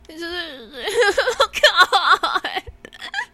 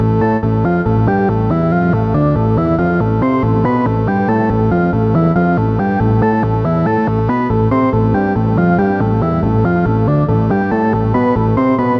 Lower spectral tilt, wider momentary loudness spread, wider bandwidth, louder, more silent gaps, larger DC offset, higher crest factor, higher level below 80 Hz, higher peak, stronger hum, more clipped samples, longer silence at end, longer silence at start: second, -1 dB/octave vs -11 dB/octave; first, 16 LU vs 2 LU; first, 16.5 kHz vs 5.6 kHz; second, -17 LUFS vs -14 LUFS; neither; neither; first, 18 dB vs 12 dB; second, -50 dBFS vs -30 dBFS; about the same, -2 dBFS vs -2 dBFS; neither; neither; about the same, 0.1 s vs 0 s; about the same, 0.1 s vs 0 s